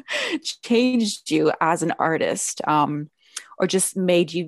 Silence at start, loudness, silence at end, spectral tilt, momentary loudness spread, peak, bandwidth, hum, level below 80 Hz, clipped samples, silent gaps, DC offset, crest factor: 0.1 s; -22 LUFS; 0 s; -4 dB/octave; 9 LU; -6 dBFS; 13.5 kHz; none; -68 dBFS; under 0.1%; none; under 0.1%; 16 dB